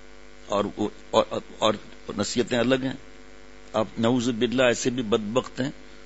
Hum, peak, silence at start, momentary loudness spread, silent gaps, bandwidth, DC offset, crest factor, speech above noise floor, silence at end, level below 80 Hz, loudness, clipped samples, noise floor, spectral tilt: none; -4 dBFS; 0.4 s; 10 LU; none; 8 kHz; 0.6%; 22 dB; 24 dB; 0 s; -54 dBFS; -26 LUFS; under 0.1%; -48 dBFS; -4.5 dB/octave